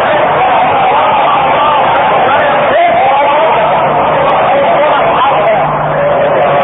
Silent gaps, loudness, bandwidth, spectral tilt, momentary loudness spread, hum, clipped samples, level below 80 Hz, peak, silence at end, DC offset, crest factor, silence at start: none; -8 LUFS; 4 kHz; -8.5 dB/octave; 1 LU; none; under 0.1%; -40 dBFS; 0 dBFS; 0 s; under 0.1%; 8 dB; 0 s